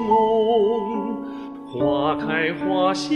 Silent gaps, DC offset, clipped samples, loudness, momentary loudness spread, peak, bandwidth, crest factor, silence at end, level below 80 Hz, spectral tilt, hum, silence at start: none; under 0.1%; under 0.1%; -21 LUFS; 13 LU; -6 dBFS; 10 kHz; 14 dB; 0 s; -54 dBFS; -5.5 dB/octave; none; 0 s